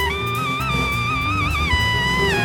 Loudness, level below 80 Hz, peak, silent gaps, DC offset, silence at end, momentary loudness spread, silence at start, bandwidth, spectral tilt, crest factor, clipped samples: -19 LUFS; -30 dBFS; -6 dBFS; none; under 0.1%; 0 s; 4 LU; 0 s; over 20 kHz; -4.5 dB/octave; 14 dB; under 0.1%